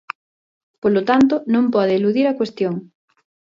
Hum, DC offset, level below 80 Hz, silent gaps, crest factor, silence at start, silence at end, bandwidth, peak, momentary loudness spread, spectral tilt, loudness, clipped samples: none; under 0.1%; -60 dBFS; none; 16 dB; 0.85 s; 0.7 s; 7.6 kHz; -4 dBFS; 12 LU; -7.5 dB/octave; -18 LUFS; under 0.1%